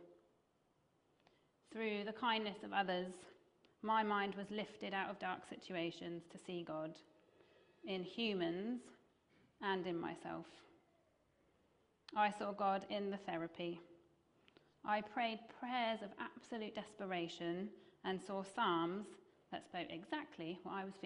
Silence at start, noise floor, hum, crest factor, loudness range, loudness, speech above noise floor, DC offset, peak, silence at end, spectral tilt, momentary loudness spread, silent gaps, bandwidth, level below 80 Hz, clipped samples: 0 s; -79 dBFS; none; 22 dB; 5 LU; -43 LUFS; 36 dB; under 0.1%; -22 dBFS; 0 s; -5.5 dB/octave; 12 LU; none; 10.5 kHz; -84 dBFS; under 0.1%